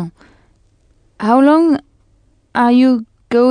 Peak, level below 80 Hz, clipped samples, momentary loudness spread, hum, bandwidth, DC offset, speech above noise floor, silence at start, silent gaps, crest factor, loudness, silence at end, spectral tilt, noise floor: 0 dBFS; -54 dBFS; under 0.1%; 12 LU; none; 10 kHz; under 0.1%; 43 dB; 0 s; none; 14 dB; -13 LUFS; 0 s; -7 dB/octave; -54 dBFS